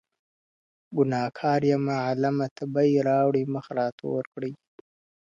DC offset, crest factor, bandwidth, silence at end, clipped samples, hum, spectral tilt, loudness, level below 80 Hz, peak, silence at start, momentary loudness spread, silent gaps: under 0.1%; 16 dB; 7.4 kHz; 0.75 s; under 0.1%; none; -8 dB/octave; -26 LUFS; -70 dBFS; -10 dBFS; 0.9 s; 10 LU; 2.51-2.56 s, 3.92-3.98 s, 4.27-4.32 s